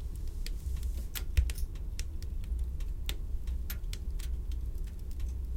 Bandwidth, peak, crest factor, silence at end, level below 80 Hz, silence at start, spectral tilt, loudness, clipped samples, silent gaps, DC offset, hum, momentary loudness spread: 17 kHz; -14 dBFS; 20 dB; 0 s; -34 dBFS; 0 s; -4.5 dB/octave; -39 LUFS; under 0.1%; none; under 0.1%; none; 8 LU